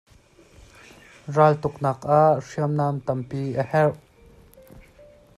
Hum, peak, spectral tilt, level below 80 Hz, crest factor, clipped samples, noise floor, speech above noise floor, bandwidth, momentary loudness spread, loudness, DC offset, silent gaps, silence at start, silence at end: none; -4 dBFS; -8 dB/octave; -56 dBFS; 20 dB; under 0.1%; -54 dBFS; 32 dB; 12 kHz; 10 LU; -22 LUFS; under 0.1%; none; 1.25 s; 0.6 s